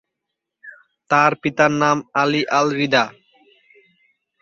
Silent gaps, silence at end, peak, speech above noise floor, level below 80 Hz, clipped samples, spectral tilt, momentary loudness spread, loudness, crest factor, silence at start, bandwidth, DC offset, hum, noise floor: none; 1.3 s; -2 dBFS; 63 dB; -64 dBFS; under 0.1%; -4.5 dB/octave; 3 LU; -18 LUFS; 20 dB; 0.65 s; 7.6 kHz; under 0.1%; none; -81 dBFS